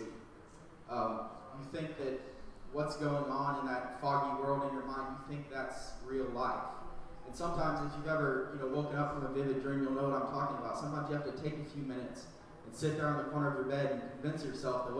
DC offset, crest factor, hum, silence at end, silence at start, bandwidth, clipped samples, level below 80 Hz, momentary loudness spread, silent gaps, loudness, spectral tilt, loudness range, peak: under 0.1%; 16 dB; none; 0 s; 0 s; 11 kHz; under 0.1%; -56 dBFS; 15 LU; none; -38 LUFS; -6.5 dB/octave; 4 LU; -20 dBFS